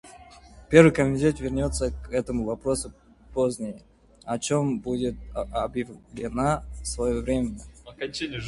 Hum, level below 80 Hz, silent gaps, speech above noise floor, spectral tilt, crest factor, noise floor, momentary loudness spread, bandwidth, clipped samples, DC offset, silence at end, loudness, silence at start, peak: none; -40 dBFS; none; 24 dB; -5.5 dB/octave; 24 dB; -49 dBFS; 16 LU; 11.5 kHz; under 0.1%; under 0.1%; 0 s; -26 LUFS; 0.05 s; -2 dBFS